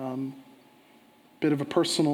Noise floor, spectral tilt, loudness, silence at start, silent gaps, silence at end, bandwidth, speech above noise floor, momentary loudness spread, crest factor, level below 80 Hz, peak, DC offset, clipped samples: -58 dBFS; -5 dB/octave; -28 LUFS; 0 s; none; 0 s; 16.5 kHz; 32 dB; 13 LU; 18 dB; -78 dBFS; -10 dBFS; under 0.1%; under 0.1%